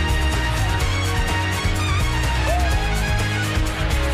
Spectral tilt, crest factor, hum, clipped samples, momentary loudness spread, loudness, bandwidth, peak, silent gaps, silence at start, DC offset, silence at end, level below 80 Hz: -4.5 dB/octave; 10 dB; none; under 0.1%; 1 LU; -21 LUFS; 15.5 kHz; -10 dBFS; none; 0 s; under 0.1%; 0 s; -24 dBFS